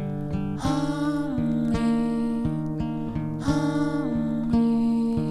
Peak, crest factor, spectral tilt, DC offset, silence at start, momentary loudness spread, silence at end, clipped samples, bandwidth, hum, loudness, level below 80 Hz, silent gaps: -10 dBFS; 14 dB; -7.5 dB/octave; under 0.1%; 0 s; 7 LU; 0 s; under 0.1%; 11.5 kHz; none; -25 LUFS; -42 dBFS; none